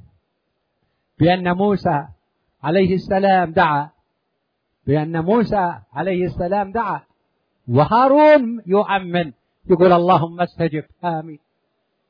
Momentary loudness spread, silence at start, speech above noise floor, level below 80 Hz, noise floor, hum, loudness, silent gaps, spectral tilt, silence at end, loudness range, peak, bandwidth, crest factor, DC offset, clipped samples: 12 LU; 1.2 s; 56 dB; -48 dBFS; -72 dBFS; none; -18 LUFS; none; -9.5 dB/octave; 0.75 s; 6 LU; -2 dBFS; 5.4 kHz; 16 dB; under 0.1%; under 0.1%